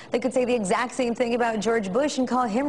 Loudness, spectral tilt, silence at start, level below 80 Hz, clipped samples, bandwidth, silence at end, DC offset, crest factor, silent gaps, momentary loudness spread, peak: -24 LUFS; -4.5 dB/octave; 0 s; -60 dBFS; under 0.1%; 11.5 kHz; 0 s; 0.2%; 14 dB; none; 2 LU; -10 dBFS